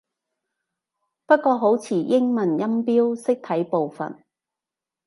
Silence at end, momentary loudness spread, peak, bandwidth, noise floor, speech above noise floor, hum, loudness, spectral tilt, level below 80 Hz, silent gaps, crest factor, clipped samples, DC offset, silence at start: 0.95 s; 6 LU; -4 dBFS; 11.5 kHz; -88 dBFS; 68 dB; none; -21 LUFS; -7 dB/octave; -78 dBFS; none; 20 dB; under 0.1%; under 0.1%; 1.3 s